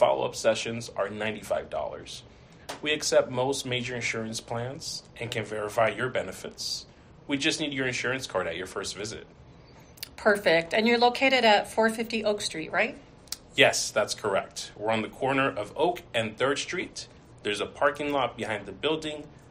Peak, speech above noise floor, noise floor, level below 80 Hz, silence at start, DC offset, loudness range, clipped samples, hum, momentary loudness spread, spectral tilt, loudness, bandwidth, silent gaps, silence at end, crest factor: -4 dBFS; 23 dB; -51 dBFS; -60 dBFS; 0 s; under 0.1%; 6 LU; under 0.1%; none; 15 LU; -3 dB/octave; -27 LUFS; 15 kHz; none; 0.1 s; 24 dB